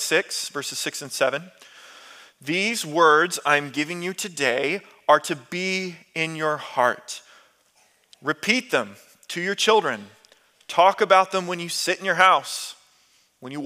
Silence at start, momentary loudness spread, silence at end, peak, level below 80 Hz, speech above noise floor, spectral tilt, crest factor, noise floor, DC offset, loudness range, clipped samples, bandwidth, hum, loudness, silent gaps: 0 s; 15 LU; 0 s; -2 dBFS; -80 dBFS; 39 dB; -2.5 dB/octave; 22 dB; -62 dBFS; under 0.1%; 5 LU; under 0.1%; 16 kHz; none; -22 LUFS; none